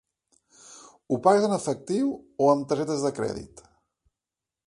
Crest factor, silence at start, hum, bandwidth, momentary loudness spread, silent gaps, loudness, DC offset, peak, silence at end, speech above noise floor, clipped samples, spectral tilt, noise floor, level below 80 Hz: 22 dB; 0.7 s; none; 11.5 kHz; 13 LU; none; -25 LUFS; under 0.1%; -6 dBFS; 1.2 s; 65 dB; under 0.1%; -6 dB/octave; -89 dBFS; -62 dBFS